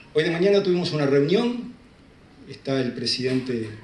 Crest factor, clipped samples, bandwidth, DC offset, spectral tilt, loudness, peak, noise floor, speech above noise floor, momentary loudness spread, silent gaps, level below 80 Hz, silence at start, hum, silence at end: 16 dB; under 0.1%; 11 kHz; under 0.1%; -6 dB/octave; -23 LUFS; -8 dBFS; -51 dBFS; 28 dB; 14 LU; none; -60 dBFS; 0.15 s; none; 0.05 s